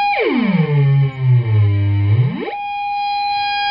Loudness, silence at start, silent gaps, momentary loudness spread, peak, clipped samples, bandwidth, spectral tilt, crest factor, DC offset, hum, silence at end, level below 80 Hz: -16 LUFS; 0 s; none; 7 LU; -4 dBFS; under 0.1%; 5.2 kHz; -10 dB/octave; 10 dB; under 0.1%; none; 0 s; -52 dBFS